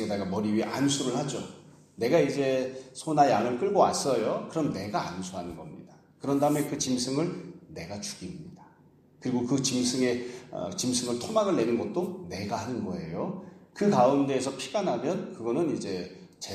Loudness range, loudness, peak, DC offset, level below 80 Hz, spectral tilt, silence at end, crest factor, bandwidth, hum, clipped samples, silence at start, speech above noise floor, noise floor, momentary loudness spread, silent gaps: 5 LU; -28 LUFS; -8 dBFS; under 0.1%; -66 dBFS; -4.5 dB/octave; 0 s; 20 dB; 15.5 kHz; none; under 0.1%; 0 s; 31 dB; -59 dBFS; 16 LU; none